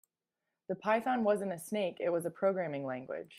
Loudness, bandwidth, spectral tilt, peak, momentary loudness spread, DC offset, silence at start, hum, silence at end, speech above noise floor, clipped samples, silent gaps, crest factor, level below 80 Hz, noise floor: -34 LUFS; 15.5 kHz; -5.5 dB/octave; -16 dBFS; 8 LU; under 0.1%; 0.7 s; none; 0 s; 55 dB; under 0.1%; none; 18 dB; -82 dBFS; -89 dBFS